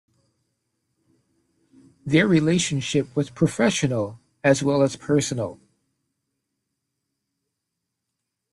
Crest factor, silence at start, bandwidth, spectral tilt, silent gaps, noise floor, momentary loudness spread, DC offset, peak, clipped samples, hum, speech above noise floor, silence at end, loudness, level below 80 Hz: 20 dB; 2.05 s; 12 kHz; -5 dB/octave; none; -82 dBFS; 10 LU; under 0.1%; -6 dBFS; under 0.1%; none; 60 dB; 3 s; -22 LUFS; -60 dBFS